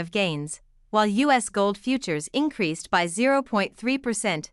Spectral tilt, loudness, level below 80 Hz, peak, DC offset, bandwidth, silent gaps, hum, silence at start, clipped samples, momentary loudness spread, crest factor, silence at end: -4 dB/octave; -24 LUFS; -60 dBFS; -8 dBFS; under 0.1%; 12 kHz; none; none; 0 s; under 0.1%; 6 LU; 18 dB; 0.05 s